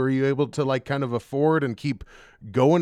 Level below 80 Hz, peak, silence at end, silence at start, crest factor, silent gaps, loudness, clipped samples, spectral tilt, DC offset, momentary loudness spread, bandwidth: -56 dBFS; -8 dBFS; 0 s; 0 s; 16 dB; none; -24 LUFS; under 0.1%; -7.5 dB/octave; under 0.1%; 8 LU; 12 kHz